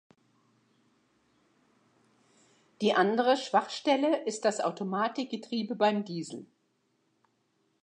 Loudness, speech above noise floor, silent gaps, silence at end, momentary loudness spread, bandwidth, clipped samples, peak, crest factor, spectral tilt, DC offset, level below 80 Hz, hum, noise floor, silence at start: -29 LUFS; 46 dB; none; 1.4 s; 11 LU; 10.5 kHz; under 0.1%; -10 dBFS; 22 dB; -4.5 dB/octave; under 0.1%; -88 dBFS; none; -74 dBFS; 2.8 s